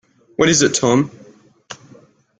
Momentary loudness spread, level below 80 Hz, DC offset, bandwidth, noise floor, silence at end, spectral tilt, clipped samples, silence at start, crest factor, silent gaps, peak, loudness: 24 LU; -52 dBFS; under 0.1%; 10 kHz; -48 dBFS; 0.65 s; -3.5 dB/octave; under 0.1%; 0.4 s; 18 dB; none; -2 dBFS; -15 LUFS